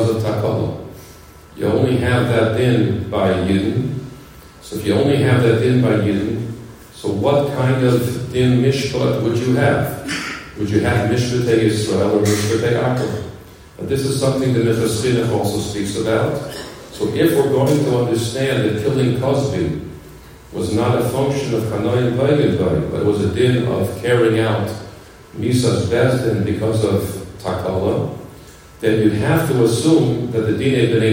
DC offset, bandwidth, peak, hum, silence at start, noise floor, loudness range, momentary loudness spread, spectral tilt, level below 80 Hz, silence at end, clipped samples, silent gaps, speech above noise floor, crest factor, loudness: under 0.1%; 16.5 kHz; -2 dBFS; none; 0 s; -41 dBFS; 2 LU; 11 LU; -6.5 dB/octave; -46 dBFS; 0 s; under 0.1%; none; 24 dB; 16 dB; -17 LUFS